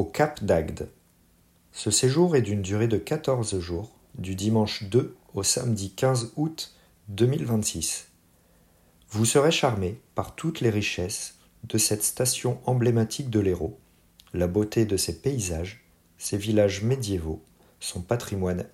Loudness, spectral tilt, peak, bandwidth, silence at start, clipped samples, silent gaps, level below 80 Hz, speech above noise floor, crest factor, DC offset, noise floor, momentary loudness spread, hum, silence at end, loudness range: -26 LUFS; -4.5 dB/octave; -8 dBFS; 16 kHz; 0 s; under 0.1%; none; -50 dBFS; 36 dB; 18 dB; under 0.1%; -61 dBFS; 13 LU; none; 0.05 s; 3 LU